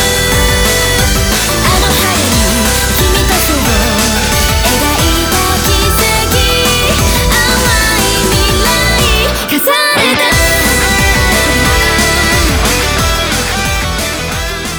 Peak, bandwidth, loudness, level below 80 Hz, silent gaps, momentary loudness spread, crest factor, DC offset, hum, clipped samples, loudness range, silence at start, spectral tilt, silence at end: 0 dBFS; over 20 kHz; -9 LUFS; -18 dBFS; none; 3 LU; 10 dB; under 0.1%; none; under 0.1%; 1 LU; 0 s; -3 dB/octave; 0 s